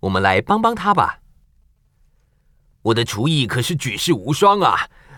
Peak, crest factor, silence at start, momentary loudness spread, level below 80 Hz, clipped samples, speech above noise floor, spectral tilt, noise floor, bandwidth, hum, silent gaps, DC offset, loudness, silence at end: -2 dBFS; 18 dB; 0.05 s; 7 LU; -50 dBFS; under 0.1%; 41 dB; -5 dB/octave; -58 dBFS; 18.5 kHz; none; none; under 0.1%; -18 LUFS; 0 s